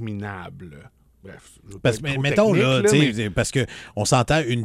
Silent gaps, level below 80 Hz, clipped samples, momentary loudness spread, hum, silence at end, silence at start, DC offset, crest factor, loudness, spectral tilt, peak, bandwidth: none; -46 dBFS; under 0.1%; 15 LU; none; 0 s; 0 s; under 0.1%; 18 dB; -20 LUFS; -5 dB/octave; -4 dBFS; 15.5 kHz